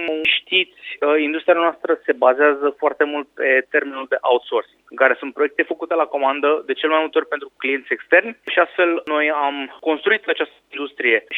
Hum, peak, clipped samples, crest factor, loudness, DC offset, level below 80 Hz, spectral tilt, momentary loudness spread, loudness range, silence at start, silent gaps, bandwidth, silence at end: none; 0 dBFS; under 0.1%; 18 dB; -19 LUFS; under 0.1%; -72 dBFS; -4.5 dB/octave; 7 LU; 2 LU; 0 s; none; 4.1 kHz; 0 s